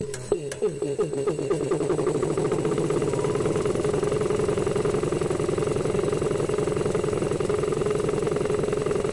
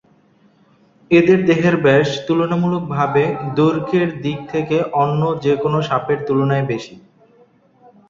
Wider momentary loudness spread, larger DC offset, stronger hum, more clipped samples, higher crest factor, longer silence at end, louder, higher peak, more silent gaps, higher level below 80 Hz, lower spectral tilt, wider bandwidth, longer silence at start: second, 2 LU vs 8 LU; neither; neither; neither; about the same, 14 dB vs 16 dB; second, 0 s vs 1.1 s; second, -25 LUFS vs -17 LUFS; second, -10 dBFS vs -2 dBFS; neither; first, -44 dBFS vs -54 dBFS; second, -6 dB/octave vs -7.5 dB/octave; first, 11.5 kHz vs 7.4 kHz; second, 0 s vs 1.1 s